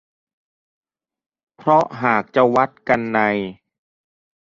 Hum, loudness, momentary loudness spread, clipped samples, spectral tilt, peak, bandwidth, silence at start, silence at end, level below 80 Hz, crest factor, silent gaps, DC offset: none; -18 LUFS; 8 LU; under 0.1%; -7 dB/octave; -2 dBFS; 7.6 kHz; 1.65 s; 0.85 s; -60 dBFS; 20 dB; none; under 0.1%